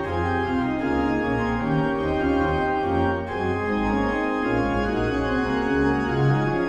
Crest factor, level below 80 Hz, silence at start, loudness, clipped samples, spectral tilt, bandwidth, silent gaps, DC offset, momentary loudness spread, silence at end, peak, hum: 12 dB; -38 dBFS; 0 s; -23 LUFS; under 0.1%; -8 dB/octave; 8.8 kHz; none; under 0.1%; 2 LU; 0 s; -10 dBFS; none